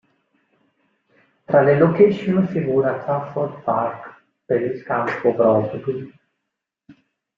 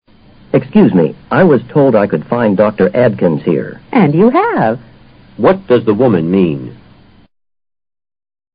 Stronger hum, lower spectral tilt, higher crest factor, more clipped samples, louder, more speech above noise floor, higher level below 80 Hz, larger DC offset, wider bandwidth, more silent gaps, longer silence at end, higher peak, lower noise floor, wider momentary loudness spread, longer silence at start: neither; second, -9.5 dB/octave vs -12 dB/octave; first, 20 dB vs 12 dB; neither; second, -19 LUFS vs -12 LUFS; first, 62 dB vs 32 dB; second, -60 dBFS vs -46 dBFS; neither; first, 5.8 kHz vs 5.2 kHz; neither; second, 0.45 s vs 1.8 s; about the same, -2 dBFS vs 0 dBFS; first, -81 dBFS vs -43 dBFS; first, 12 LU vs 7 LU; first, 1.5 s vs 0.55 s